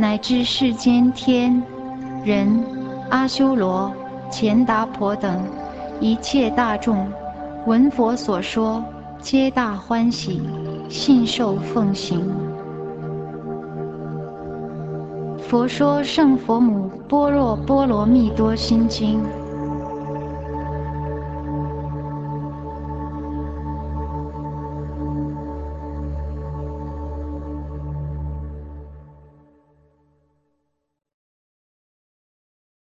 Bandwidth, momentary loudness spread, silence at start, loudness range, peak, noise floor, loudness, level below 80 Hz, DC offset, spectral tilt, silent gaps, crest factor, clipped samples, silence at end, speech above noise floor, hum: 8.2 kHz; 14 LU; 0 s; 11 LU; -4 dBFS; -73 dBFS; -22 LUFS; -36 dBFS; under 0.1%; -6.5 dB/octave; none; 18 dB; under 0.1%; 3.65 s; 54 dB; none